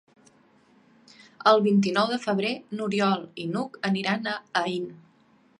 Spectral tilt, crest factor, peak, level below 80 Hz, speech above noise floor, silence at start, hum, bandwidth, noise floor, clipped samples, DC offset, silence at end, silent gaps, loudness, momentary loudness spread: -5.5 dB/octave; 22 dB; -6 dBFS; -76 dBFS; 36 dB; 1.4 s; none; 10.5 kHz; -61 dBFS; under 0.1%; under 0.1%; 0.65 s; none; -25 LUFS; 11 LU